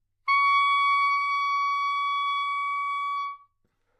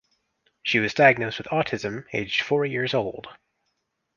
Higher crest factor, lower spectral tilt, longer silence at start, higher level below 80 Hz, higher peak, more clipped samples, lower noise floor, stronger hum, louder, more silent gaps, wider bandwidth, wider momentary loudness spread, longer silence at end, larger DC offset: second, 12 dB vs 22 dB; second, 4.5 dB/octave vs -5 dB/octave; second, 0.25 s vs 0.65 s; second, -78 dBFS vs -60 dBFS; second, -14 dBFS vs -2 dBFS; neither; second, -72 dBFS vs -76 dBFS; neither; about the same, -24 LUFS vs -23 LUFS; neither; first, 9.6 kHz vs 7.2 kHz; second, 8 LU vs 13 LU; second, 0.6 s vs 0.85 s; neither